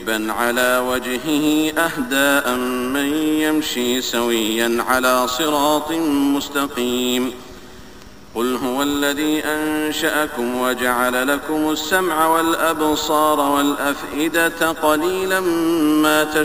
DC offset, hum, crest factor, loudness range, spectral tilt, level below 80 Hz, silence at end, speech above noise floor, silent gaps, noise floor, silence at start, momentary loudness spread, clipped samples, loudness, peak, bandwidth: 0.7%; none; 18 dB; 4 LU; -3 dB/octave; -48 dBFS; 0 s; 23 dB; none; -41 dBFS; 0 s; 5 LU; under 0.1%; -18 LUFS; -2 dBFS; 16 kHz